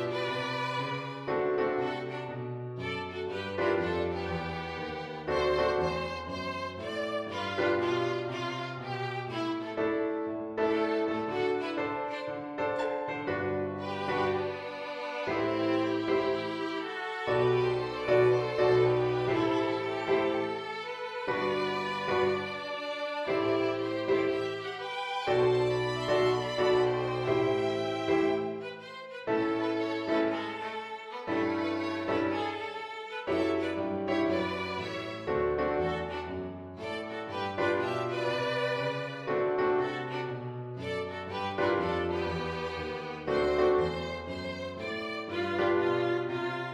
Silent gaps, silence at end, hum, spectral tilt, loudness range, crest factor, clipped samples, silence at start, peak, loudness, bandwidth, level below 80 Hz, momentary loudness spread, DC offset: none; 0 s; none; -6.5 dB/octave; 5 LU; 18 dB; under 0.1%; 0 s; -14 dBFS; -31 LUFS; 10.5 kHz; -58 dBFS; 9 LU; under 0.1%